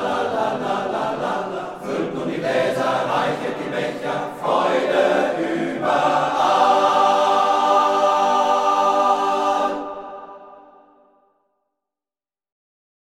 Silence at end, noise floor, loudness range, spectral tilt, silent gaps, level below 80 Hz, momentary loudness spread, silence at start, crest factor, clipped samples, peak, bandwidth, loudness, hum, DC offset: 2.45 s; under -90 dBFS; 7 LU; -4.5 dB/octave; none; -62 dBFS; 9 LU; 0 s; 16 dB; under 0.1%; -4 dBFS; 14 kHz; -19 LUFS; none; under 0.1%